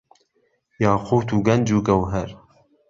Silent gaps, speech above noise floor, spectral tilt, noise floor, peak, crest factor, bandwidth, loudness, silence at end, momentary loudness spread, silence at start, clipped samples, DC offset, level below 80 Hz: none; 48 dB; -7 dB/octave; -67 dBFS; -4 dBFS; 18 dB; 7.6 kHz; -20 LUFS; 0.55 s; 8 LU; 0.8 s; under 0.1%; under 0.1%; -44 dBFS